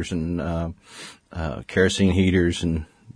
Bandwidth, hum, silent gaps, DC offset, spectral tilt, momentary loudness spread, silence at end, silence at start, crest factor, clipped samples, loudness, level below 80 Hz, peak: 10.5 kHz; none; none; under 0.1%; -6 dB/octave; 19 LU; 0.05 s; 0 s; 18 dB; under 0.1%; -23 LUFS; -40 dBFS; -4 dBFS